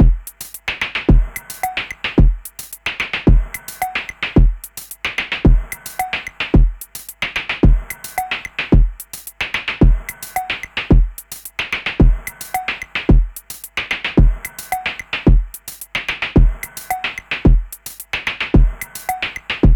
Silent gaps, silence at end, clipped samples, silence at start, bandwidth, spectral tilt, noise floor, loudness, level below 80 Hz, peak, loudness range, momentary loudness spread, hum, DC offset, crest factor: none; 0 s; under 0.1%; 0 s; 19.5 kHz; -5.5 dB/octave; -34 dBFS; -19 LUFS; -18 dBFS; 0 dBFS; 1 LU; 11 LU; none; under 0.1%; 16 dB